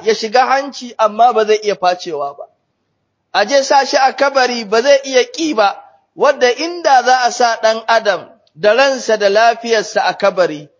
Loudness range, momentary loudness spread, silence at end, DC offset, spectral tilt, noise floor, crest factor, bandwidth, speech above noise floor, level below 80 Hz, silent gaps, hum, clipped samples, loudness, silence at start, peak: 2 LU; 6 LU; 0.15 s; under 0.1%; -2 dB/octave; -67 dBFS; 14 dB; 7.6 kHz; 54 dB; -68 dBFS; none; none; under 0.1%; -13 LUFS; 0 s; 0 dBFS